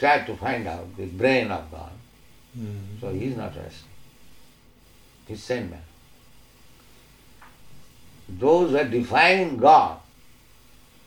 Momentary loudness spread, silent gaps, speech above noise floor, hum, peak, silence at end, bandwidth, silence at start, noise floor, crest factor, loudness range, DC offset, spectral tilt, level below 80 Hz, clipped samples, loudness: 24 LU; none; 32 dB; none; -4 dBFS; 1.05 s; 19.5 kHz; 0 s; -54 dBFS; 22 dB; 17 LU; under 0.1%; -5.5 dB/octave; -54 dBFS; under 0.1%; -22 LUFS